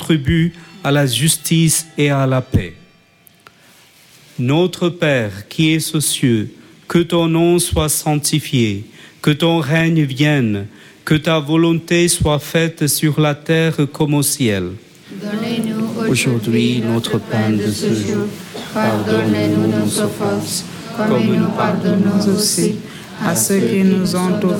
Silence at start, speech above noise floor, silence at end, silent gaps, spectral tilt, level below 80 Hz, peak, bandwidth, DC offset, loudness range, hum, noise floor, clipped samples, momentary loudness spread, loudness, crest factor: 0 s; 34 dB; 0 s; none; -5 dB/octave; -40 dBFS; -2 dBFS; 17.5 kHz; under 0.1%; 3 LU; none; -50 dBFS; under 0.1%; 9 LU; -16 LUFS; 14 dB